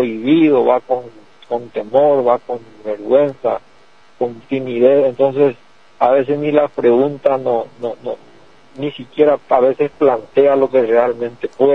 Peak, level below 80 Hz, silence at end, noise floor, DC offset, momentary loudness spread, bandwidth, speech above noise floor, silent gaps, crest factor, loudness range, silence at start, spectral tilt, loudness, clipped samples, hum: 0 dBFS; -62 dBFS; 0 s; -50 dBFS; 0.5%; 13 LU; 6.2 kHz; 35 dB; none; 16 dB; 3 LU; 0 s; -8.5 dB/octave; -15 LUFS; under 0.1%; none